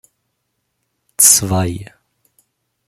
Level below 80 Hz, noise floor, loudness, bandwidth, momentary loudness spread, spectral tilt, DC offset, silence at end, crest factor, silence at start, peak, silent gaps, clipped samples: -50 dBFS; -71 dBFS; -11 LUFS; over 20 kHz; 23 LU; -2.5 dB/octave; under 0.1%; 1 s; 20 dB; 1.2 s; 0 dBFS; none; under 0.1%